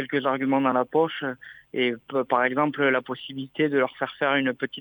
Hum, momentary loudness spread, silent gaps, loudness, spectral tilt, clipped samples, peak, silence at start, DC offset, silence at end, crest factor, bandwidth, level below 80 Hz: none; 11 LU; none; -25 LUFS; -8 dB/octave; under 0.1%; -6 dBFS; 0 s; under 0.1%; 0 s; 18 dB; 19.5 kHz; -74 dBFS